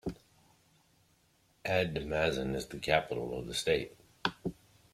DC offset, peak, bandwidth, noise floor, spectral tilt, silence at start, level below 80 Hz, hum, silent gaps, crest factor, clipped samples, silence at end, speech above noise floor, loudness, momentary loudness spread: under 0.1%; -12 dBFS; 16 kHz; -70 dBFS; -4.5 dB/octave; 0.05 s; -56 dBFS; none; none; 24 dB; under 0.1%; 0.4 s; 37 dB; -34 LUFS; 12 LU